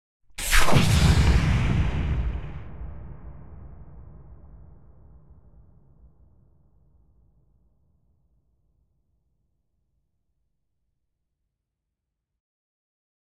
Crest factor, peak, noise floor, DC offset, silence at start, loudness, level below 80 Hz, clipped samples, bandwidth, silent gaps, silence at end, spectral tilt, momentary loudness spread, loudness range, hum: 22 dB; -4 dBFS; -83 dBFS; under 0.1%; 0.2 s; -23 LUFS; -32 dBFS; under 0.1%; 15.5 kHz; none; 1 s; -5 dB/octave; 27 LU; 26 LU; none